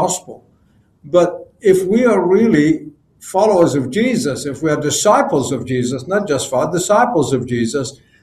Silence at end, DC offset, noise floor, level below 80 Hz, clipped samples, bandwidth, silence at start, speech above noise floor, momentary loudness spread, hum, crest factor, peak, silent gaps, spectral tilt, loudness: 0.3 s; under 0.1%; -54 dBFS; -50 dBFS; under 0.1%; 14.5 kHz; 0 s; 39 dB; 8 LU; none; 14 dB; 0 dBFS; none; -5 dB/octave; -15 LUFS